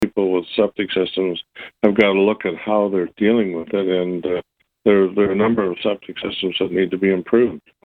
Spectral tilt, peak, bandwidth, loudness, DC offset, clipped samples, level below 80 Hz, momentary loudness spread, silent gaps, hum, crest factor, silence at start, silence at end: -7.5 dB/octave; 0 dBFS; 4.9 kHz; -19 LUFS; under 0.1%; under 0.1%; -56 dBFS; 8 LU; none; none; 18 dB; 0 s; 0.3 s